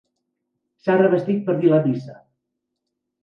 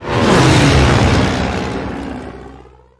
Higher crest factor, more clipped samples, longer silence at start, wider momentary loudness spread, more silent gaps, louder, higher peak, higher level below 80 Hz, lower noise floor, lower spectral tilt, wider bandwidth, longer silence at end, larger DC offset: about the same, 18 dB vs 14 dB; neither; first, 0.85 s vs 0 s; second, 10 LU vs 17 LU; neither; second, -19 LUFS vs -12 LUFS; second, -4 dBFS vs 0 dBFS; second, -70 dBFS vs -24 dBFS; first, -79 dBFS vs -39 dBFS; first, -10 dB/octave vs -5.5 dB/octave; second, 5.8 kHz vs 11 kHz; first, 1.1 s vs 0.4 s; neither